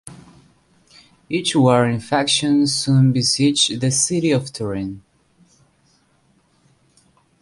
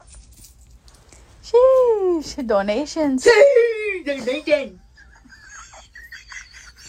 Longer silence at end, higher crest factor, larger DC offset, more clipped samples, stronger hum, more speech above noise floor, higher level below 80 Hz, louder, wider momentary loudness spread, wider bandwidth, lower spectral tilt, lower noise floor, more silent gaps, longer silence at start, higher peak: first, 2.4 s vs 0 s; about the same, 18 dB vs 18 dB; neither; neither; neither; first, 42 dB vs 31 dB; about the same, -54 dBFS vs -50 dBFS; about the same, -17 LUFS vs -17 LUFS; second, 11 LU vs 26 LU; second, 11.5 kHz vs 14 kHz; about the same, -4.5 dB/octave vs -3.5 dB/octave; first, -60 dBFS vs -48 dBFS; neither; about the same, 0.05 s vs 0.15 s; about the same, -2 dBFS vs -2 dBFS